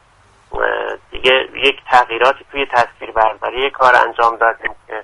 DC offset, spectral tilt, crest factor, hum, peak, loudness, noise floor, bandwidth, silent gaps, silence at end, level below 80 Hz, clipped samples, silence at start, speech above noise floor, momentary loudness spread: under 0.1%; -3 dB/octave; 16 dB; none; 0 dBFS; -15 LUFS; -50 dBFS; 11.5 kHz; none; 0 s; -42 dBFS; under 0.1%; 0.5 s; 35 dB; 10 LU